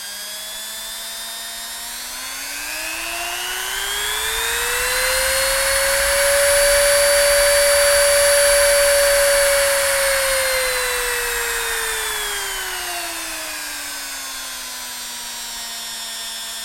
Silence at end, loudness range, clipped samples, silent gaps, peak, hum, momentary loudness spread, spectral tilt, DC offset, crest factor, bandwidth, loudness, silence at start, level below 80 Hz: 0 s; 12 LU; under 0.1%; none; -2 dBFS; none; 14 LU; 1 dB/octave; under 0.1%; 16 dB; 16.5 kHz; -18 LUFS; 0 s; -40 dBFS